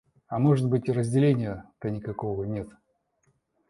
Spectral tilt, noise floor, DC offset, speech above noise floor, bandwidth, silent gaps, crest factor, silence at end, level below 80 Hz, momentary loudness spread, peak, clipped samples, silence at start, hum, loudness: -8.5 dB/octave; -71 dBFS; under 0.1%; 45 dB; 11.5 kHz; none; 18 dB; 1 s; -56 dBFS; 12 LU; -10 dBFS; under 0.1%; 0.3 s; none; -27 LUFS